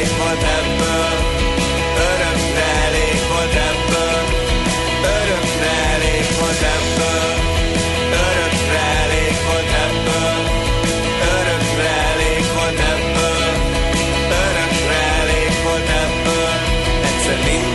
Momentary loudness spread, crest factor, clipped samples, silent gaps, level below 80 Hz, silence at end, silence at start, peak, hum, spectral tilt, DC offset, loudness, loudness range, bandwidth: 2 LU; 14 dB; under 0.1%; none; -24 dBFS; 0 s; 0 s; -4 dBFS; none; -3.5 dB/octave; under 0.1%; -16 LUFS; 0 LU; 12 kHz